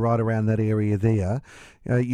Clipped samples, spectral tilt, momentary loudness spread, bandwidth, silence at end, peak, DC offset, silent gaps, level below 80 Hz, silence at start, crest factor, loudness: under 0.1%; -9.5 dB/octave; 8 LU; 9.4 kHz; 0 s; -8 dBFS; under 0.1%; none; -50 dBFS; 0 s; 14 dB; -24 LUFS